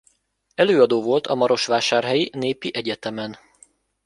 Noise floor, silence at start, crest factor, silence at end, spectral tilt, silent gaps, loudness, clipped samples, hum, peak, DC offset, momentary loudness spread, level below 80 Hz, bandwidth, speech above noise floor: -63 dBFS; 0.6 s; 20 dB; 0.7 s; -4 dB/octave; none; -20 LUFS; under 0.1%; none; -2 dBFS; under 0.1%; 13 LU; -64 dBFS; 11.5 kHz; 43 dB